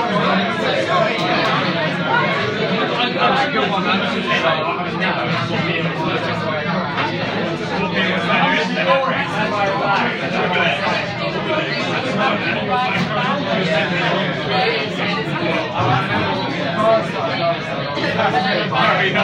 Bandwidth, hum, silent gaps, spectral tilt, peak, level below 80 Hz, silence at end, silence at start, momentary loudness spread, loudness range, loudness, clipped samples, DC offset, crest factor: 10 kHz; none; none; -5.5 dB/octave; -2 dBFS; -52 dBFS; 0 s; 0 s; 4 LU; 2 LU; -18 LUFS; under 0.1%; under 0.1%; 16 dB